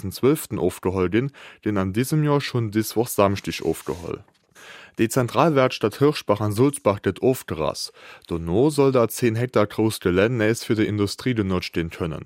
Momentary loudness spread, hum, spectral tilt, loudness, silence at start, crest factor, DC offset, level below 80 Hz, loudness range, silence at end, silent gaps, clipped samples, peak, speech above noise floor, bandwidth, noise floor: 11 LU; none; -6 dB/octave; -22 LUFS; 0.05 s; 20 dB; under 0.1%; -54 dBFS; 3 LU; 0 s; none; under 0.1%; -2 dBFS; 24 dB; 16 kHz; -46 dBFS